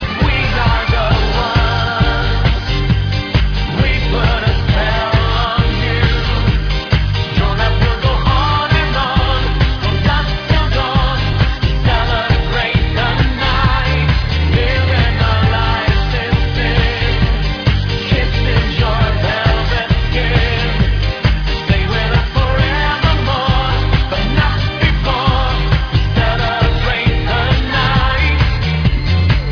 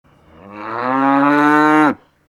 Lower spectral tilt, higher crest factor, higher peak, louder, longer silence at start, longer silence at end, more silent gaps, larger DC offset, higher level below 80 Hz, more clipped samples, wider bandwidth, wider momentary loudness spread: about the same, -6.5 dB/octave vs -6.5 dB/octave; about the same, 12 dB vs 16 dB; about the same, 0 dBFS vs 0 dBFS; about the same, -15 LUFS vs -14 LUFS; second, 0 s vs 0.45 s; second, 0 s vs 0.35 s; neither; neither; first, -18 dBFS vs -62 dBFS; neither; second, 5.4 kHz vs 12 kHz; second, 2 LU vs 17 LU